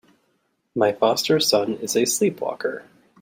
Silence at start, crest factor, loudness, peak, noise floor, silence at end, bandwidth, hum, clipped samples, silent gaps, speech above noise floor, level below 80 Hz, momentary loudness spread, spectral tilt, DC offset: 0.75 s; 18 dB; -21 LUFS; -4 dBFS; -70 dBFS; 0.4 s; 16.5 kHz; none; under 0.1%; none; 48 dB; -66 dBFS; 11 LU; -3 dB/octave; under 0.1%